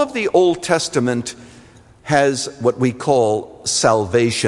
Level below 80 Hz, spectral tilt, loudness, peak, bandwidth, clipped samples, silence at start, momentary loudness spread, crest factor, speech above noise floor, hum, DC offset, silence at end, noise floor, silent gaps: -56 dBFS; -4 dB/octave; -17 LUFS; -2 dBFS; 11.5 kHz; under 0.1%; 0 s; 6 LU; 16 dB; 28 dB; none; under 0.1%; 0 s; -45 dBFS; none